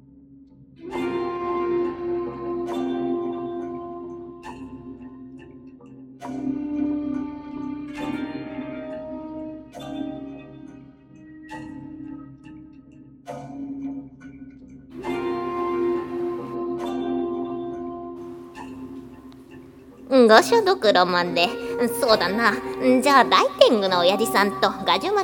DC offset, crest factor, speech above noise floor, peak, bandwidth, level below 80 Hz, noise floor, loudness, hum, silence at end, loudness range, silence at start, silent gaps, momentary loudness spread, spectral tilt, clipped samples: under 0.1%; 24 dB; 30 dB; 0 dBFS; 17.5 kHz; -56 dBFS; -49 dBFS; -22 LUFS; none; 0 s; 19 LU; 0.3 s; none; 24 LU; -4 dB/octave; under 0.1%